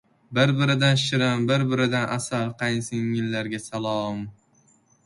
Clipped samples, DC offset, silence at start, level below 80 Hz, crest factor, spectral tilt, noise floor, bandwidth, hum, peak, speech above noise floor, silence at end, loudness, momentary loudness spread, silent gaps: under 0.1%; under 0.1%; 0.3 s; -60 dBFS; 18 dB; -5.5 dB/octave; -61 dBFS; 11.5 kHz; none; -6 dBFS; 38 dB; 0.75 s; -24 LUFS; 9 LU; none